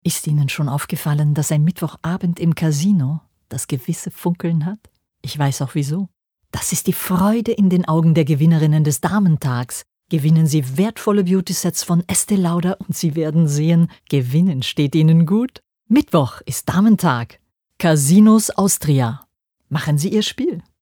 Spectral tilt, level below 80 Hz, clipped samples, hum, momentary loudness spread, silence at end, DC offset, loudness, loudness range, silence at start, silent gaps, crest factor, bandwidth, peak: -6 dB/octave; -54 dBFS; under 0.1%; none; 10 LU; 0.2 s; under 0.1%; -17 LUFS; 5 LU; 0.05 s; none; 14 dB; over 20 kHz; -2 dBFS